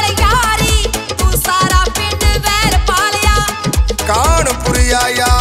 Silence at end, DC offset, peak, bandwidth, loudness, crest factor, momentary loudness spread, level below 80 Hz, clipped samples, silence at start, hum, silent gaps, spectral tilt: 0 s; under 0.1%; 0 dBFS; 16.5 kHz; -13 LUFS; 12 dB; 4 LU; -16 dBFS; under 0.1%; 0 s; none; none; -3 dB/octave